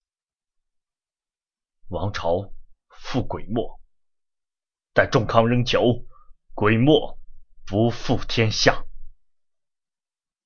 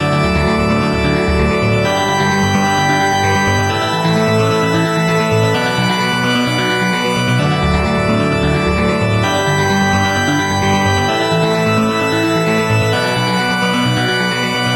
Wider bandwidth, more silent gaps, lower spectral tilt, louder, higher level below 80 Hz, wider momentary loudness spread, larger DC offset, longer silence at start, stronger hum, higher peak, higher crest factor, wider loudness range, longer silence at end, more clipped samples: second, 7 kHz vs 16 kHz; neither; about the same, -5.5 dB/octave vs -5 dB/octave; second, -22 LUFS vs -14 LUFS; second, -38 dBFS vs -30 dBFS; first, 16 LU vs 1 LU; neither; first, 1.85 s vs 0 s; neither; about the same, -2 dBFS vs -2 dBFS; first, 24 dB vs 10 dB; first, 9 LU vs 1 LU; first, 1.35 s vs 0 s; neither